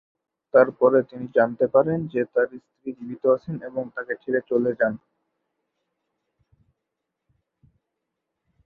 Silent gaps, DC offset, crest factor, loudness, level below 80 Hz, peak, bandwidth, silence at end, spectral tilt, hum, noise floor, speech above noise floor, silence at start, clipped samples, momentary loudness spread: none; under 0.1%; 22 dB; -23 LUFS; -68 dBFS; -4 dBFS; 4.6 kHz; 3.7 s; -10.5 dB/octave; none; -82 dBFS; 60 dB; 0.55 s; under 0.1%; 13 LU